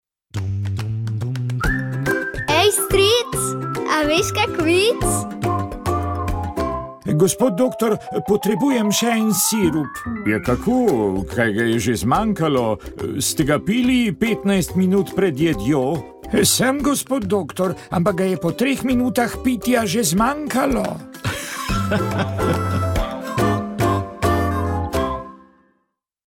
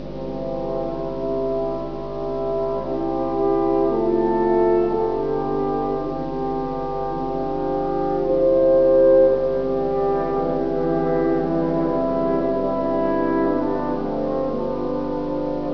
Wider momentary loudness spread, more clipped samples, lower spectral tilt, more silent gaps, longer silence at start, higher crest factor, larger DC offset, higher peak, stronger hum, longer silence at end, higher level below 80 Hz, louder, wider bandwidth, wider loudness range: about the same, 8 LU vs 9 LU; neither; second, -4.5 dB/octave vs -9.5 dB/octave; neither; first, 0.35 s vs 0 s; about the same, 16 dB vs 14 dB; second, under 0.1% vs 2%; about the same, -4 dBFS vs -6 dBFS; neither; first, 0.9 s vs 0 s; first, -36 dBFS vs -42 dBFS; about the same, -19 LUFS vs -21 LUFS; first, 17.5 kHz vs 5.4 kHz; about the same, 3 LU vs 5 LU